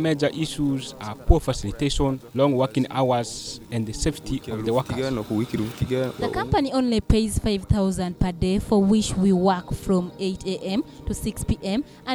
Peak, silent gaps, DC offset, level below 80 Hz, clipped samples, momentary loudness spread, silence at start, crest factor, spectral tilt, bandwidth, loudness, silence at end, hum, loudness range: 0 dBFS; none; under 0.1%; -34 dBFS; under 0.1%; 9 LU; 0 s; 22 dB; -6 dB/octave; over 20 kHz; -24 LUFS; 0 s; none; 4 LU